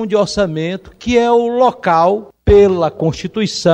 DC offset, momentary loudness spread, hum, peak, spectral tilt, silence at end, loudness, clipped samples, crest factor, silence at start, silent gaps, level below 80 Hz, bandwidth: under 0.1%; 9 LU; none; -2 dBFS; -6 dB/octave; 0 s; -14 LUFS; under 0.1%; 12 dB; 0 s; none; -32 dBFS; 9.4 kHz